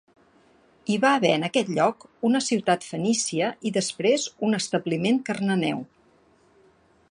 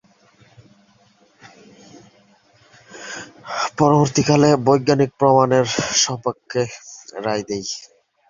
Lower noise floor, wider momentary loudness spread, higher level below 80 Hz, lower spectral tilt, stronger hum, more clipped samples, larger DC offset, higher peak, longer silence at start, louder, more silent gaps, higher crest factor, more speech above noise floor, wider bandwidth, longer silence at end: first, -60 dBFS vs -56 dBFS; second, 6 LU vs 18 LU; second, -70 dBFS vs -56 dBFS; about the same, -4 dB/octave vs -4.5 dB/octave; neither; neither; neither; second, -6 dBFS vs 0 dBFS; second, 0.9 s vs 2.95 s; second, -24 LUFS vs -18 LUFS; neither; about the same, 20 dB vs 20 dB; about the same, 36 dB vs 39 dB; first, 11 kHz vs 7.6 kHz; first, 1.25 s vs 0.45 s